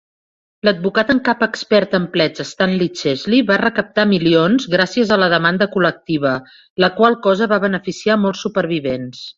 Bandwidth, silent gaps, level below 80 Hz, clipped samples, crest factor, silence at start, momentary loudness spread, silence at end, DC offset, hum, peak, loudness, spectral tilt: 7.6 kHz; 6.70-6.76 s; -54 dBFS; under 0.1%; 16 dB; 0.65 s; 7 LU; 0.05 s; under 0.1%; none; -2 dBFS; -16 LUFS; -5.5 dB/octave